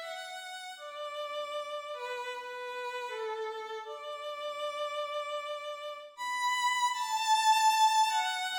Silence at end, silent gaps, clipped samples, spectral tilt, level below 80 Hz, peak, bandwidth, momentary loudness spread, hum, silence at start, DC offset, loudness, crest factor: 0 s; none; under 0.1%; 3 dB/octave; -86 dBFS; -16 dBFS; over 20 kHz; 16 LU; none; 0 s; under 0.1%; -32 LUFS; 18 dB